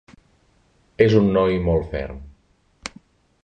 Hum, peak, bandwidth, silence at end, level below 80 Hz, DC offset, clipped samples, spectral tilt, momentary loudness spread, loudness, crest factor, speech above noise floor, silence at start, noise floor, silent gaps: none; -2 dBFS; 9 kHz; 0.55 s; -38 dBFS; under 0.1%; under 0.1%; -7.5 dB/octave; 20 LU; -19 LUFS; 20 dB; 42 dB; 1 s; -60 dBFS; none